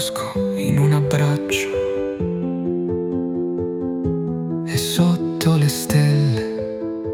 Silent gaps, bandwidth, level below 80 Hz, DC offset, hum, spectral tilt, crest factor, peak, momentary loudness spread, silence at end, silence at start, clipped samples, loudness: none; 17.5 kHz; -48 dBFS; under 0.1%; none; -6 dB/octave; 14 dB; -4 dBFS; 7 LU; 0 s; 0 s; under 0.1%; -20 LUFS